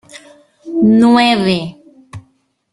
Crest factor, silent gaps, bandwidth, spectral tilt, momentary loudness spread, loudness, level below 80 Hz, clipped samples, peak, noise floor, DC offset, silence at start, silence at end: 14 dB; none; 11.5 kHz; -6 dB/octave; 14 LU; -12 LUFS; -52 dBFS; under 0.1%; 0 dBFS; -57 dBFS; under 0.1%; 0.15 s; 0.5 s